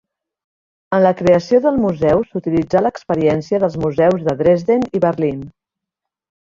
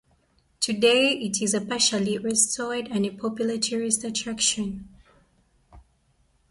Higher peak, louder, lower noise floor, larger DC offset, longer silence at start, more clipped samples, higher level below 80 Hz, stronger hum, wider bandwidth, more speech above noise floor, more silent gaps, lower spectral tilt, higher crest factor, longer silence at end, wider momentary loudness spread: first, -2 dBFS vs -8 dBFS; first, -16 LUFS vs -24 LUFS; first, -83 dBFS vs -65 dBFS; neither; first, 0.9 s vs 0.6 s; neither; first, -48 dBFS vs -58 dBFS; neither; second, 7.4 kHz vs 11.5 kHz; first, 67 dB vs 41 dB; neither; first, -8 dB/octave vs -2.5 dB/octave; about the same, 16 dB vs 20 dB; first, 1 s vs 0.7 s; second, 6 LU vs 9 LU